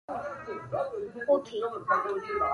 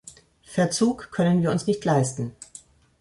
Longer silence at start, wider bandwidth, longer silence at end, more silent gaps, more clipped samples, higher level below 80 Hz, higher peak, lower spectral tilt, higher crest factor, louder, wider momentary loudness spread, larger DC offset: about the same, 0.1 s vs 0.05 s; about the same, 10.5 kHz vs 11.5 kHz; second, 0 s vs 0.4 s; neither; neither; about the same, -62 dBFS vs -58 dBFS; second, -12 dBFS vs -8 dBFS; about the same, -6 dB/octave vs -6 dB/octave; about the same, 18 dB vs 16 dB; second, -31 LUFS vs -24 LUFS; second, 9 LU vs 13 LU; neither